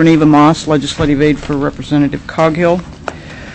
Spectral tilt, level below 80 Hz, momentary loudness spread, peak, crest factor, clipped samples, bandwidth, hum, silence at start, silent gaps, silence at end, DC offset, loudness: -6.5 dB/octave; -34 dBFS; 17 LU; -2 dBFS; 10 dB; under 0.1%; 8.6 kHz; none; 0 s; none; 0 s; under 0.1%; -12 LUFS